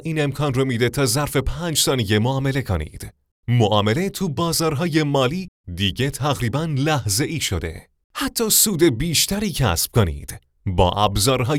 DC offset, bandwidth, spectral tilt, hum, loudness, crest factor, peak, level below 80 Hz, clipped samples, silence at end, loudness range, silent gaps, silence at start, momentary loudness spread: under 0.1%; over 20 kHz; -4 dB/octave; none; -20 LUFS; 18 dB; -2 dBFS; -38 dBFS; under 0.1%; 0 s; 3 LU; 3.31-3.43 s, 5.48-5.64 s, 8.04-8.10 s; 0 s; 11 LU